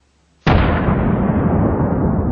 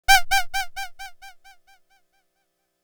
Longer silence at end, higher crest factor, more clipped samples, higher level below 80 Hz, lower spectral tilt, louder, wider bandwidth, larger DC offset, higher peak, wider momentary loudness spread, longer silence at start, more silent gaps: second, 0 s vs 1.55 s; second, 14 dB vs 24 dB; neither; first, -26 dBFS vs -40 dBFS; first, -9.5 dB/octave vs 1.5 dB/octave; first, -17 LUFS vs -22 LUFS; second, 6.4 kHz vs over 20 kHz; neither; about the same, -2 dBFS vs -2 dBFS; second, 2 LU vs 24 LU; first, 0.45 s vs 0.1 s; neither